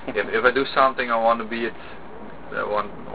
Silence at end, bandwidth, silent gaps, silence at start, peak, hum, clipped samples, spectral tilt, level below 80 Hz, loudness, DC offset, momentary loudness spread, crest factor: 0 s; 4 kHz; none; 0 s; -4 dBFS; none; under 0.1%; -8 dB/octave; -52 dBFS; -22 LUFS; 1%; 20 LU; 20 dB